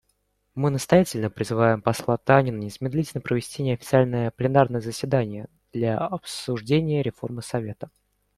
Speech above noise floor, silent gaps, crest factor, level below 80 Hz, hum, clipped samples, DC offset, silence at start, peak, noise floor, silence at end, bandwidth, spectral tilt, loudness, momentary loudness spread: 48 dB; none; 22 dB; -54 dBFS; none; under 0.1%; under 0.1%; 0.55 s; -2 dBFS; -71 dBFS; 0.5 s; 15 kHz; -6.5 dB/octave; -24 LUFS; 12 LU